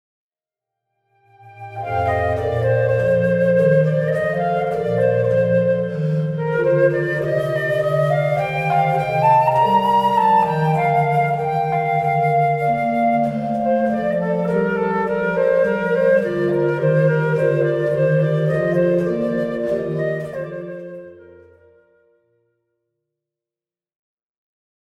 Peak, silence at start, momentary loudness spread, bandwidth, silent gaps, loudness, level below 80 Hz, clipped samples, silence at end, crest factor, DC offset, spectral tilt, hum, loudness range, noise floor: -4 dBFS; 1.45 s; 6 LU; 12.5 kHz; none; -18 LUFS; -50 dBFS; under 0.1%; 3.75 s; 14 dB; under 0.1%; -8.5 dB/octave; none; 6 LU; under -90 dBFS